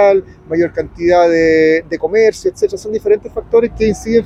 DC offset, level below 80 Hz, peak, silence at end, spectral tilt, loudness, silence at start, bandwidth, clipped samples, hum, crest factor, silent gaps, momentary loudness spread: under 0.1%; -38 dBFS; 0 dBFS; 0 s; -6 dB/octave; -14 LUFS; 0 s; 11 kHz; under 0.1%; none; 12 dB; none; 7 LU